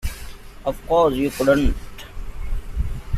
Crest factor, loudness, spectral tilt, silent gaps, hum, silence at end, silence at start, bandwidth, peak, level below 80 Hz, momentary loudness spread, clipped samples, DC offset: 18 dB; -21 LUFS; -6 dB/octave; none; none; 0 s; 0 s; 15 kHz; -4 dBFS; -28 dBFS; 20 LU; under 0.1%; under 0.1%